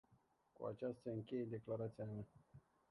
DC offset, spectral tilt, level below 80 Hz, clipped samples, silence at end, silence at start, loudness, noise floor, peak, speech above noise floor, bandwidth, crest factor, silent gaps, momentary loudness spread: under 0.1%; -9.5 dB/octave; -78 dBFS; under 0.1%; 0.3 s; 0.1 s; -48 LUFS; -77 dBFS; -34 dBFS; 30 dB; 11 kHz; 16 dB; none; 20 LU